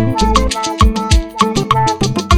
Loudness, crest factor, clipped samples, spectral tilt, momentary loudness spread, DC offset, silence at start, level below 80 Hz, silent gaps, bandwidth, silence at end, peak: -14 LUFS; 12 dB; 0.1%; -5 dB/octave; 3 LU; under 0.1%; 0 s; -18 dBFS; none; 15.5 kHz; 0 s; 0 dBFS